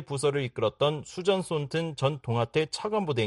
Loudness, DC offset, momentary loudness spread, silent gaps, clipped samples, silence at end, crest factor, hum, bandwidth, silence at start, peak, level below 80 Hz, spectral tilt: -29 LUFS; under 0.1%; 3 LU; none; under 0.1%; 0 s; 16 dB; none; 11.5 kHz; 0 s; -12 dBFS; -62 dBFS; -5.5 dB/octave